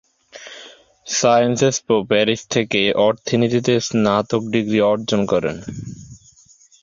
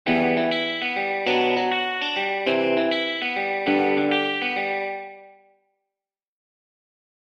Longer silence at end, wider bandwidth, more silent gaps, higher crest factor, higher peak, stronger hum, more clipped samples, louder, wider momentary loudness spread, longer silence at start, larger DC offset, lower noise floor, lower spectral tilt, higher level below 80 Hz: second, 0.65 s vs 1.95 s; about the same, 7.6 kHz vs 8.2 kHz; neither; about the same, 18 dB vs 16 dB; first, -2 dBFS vs -8 dBFS; neither; neither; first, -18 LUFS vs -22 LUFS; first, 20 LU vs 4 LU; first, 0.35 s vs 0.05 s; neither; second, -51 dBFS vs -89 dBFS; about the same, -4.5 dB/octave vs -5 dB/octave; first, -52 dBFS vs -68 dBFS